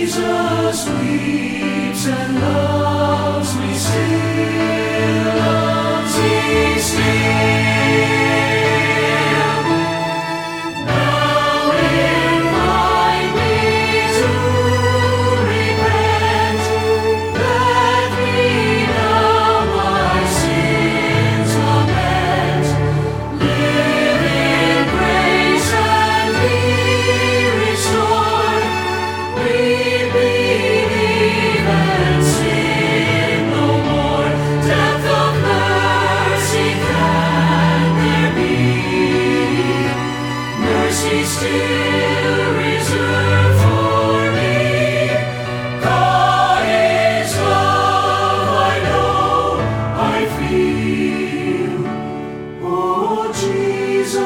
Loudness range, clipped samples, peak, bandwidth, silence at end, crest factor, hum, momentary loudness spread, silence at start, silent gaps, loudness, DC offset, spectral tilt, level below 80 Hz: 3 LU; under 0.1%; -2 dBFS; 17.5 kHz; 0 s; 14 dB; none; 5 LU; 0 s; none; -15 LUFS; under 0.1%; -5 dB/octave; -36 dBFS